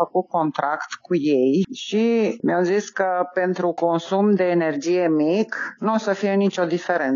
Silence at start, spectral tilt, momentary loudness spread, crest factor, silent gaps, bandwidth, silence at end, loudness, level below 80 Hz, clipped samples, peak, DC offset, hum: 0 s; -6 dB/octave; 5 LU; 14 dB; none; 7.4 kHz; 0 s; -21 LUFS; -74 dBFS; under 0.1%; -6 dBFS; under 0.1%; none